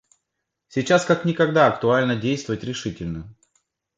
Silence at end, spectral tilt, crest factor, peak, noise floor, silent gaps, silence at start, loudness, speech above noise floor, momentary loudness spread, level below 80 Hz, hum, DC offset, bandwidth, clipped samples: 0.65 s; -5.5 dB/octave; 22 dB; -2 dBFS; -80 dBFS; none; 0.75 s; -21 LUFS; 59 dB; 13 LU; -52 dBFS; none; under 0.1%; 9.2 kHz; under 0.1%